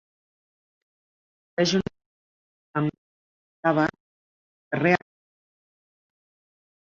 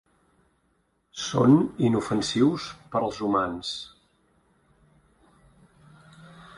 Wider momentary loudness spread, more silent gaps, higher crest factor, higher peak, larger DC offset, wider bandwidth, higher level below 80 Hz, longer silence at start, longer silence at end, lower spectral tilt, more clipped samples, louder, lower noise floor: second, 10 LU vs 15 LU; first, 2.06-2.74 s, 2.98-3.63 s, 4.00-4.71 s vs none; about the same, 24 dB vs 20 dB; about the same, -6 dBFS vs -6 dBFS; neither; second, 7.6 kHz vs 11.5 kHz; second, -64 dBFS vs -58 dBFS; first, 1.6 s vs 1.15 s; first, 1.85 s vs 0.15 s; about the same, -5.5 dB/octave vs -6 dB/octave; neither; about the same, -25 LUFS vs -25 LUFS; first, under -90 dBFS vs -70 dBFS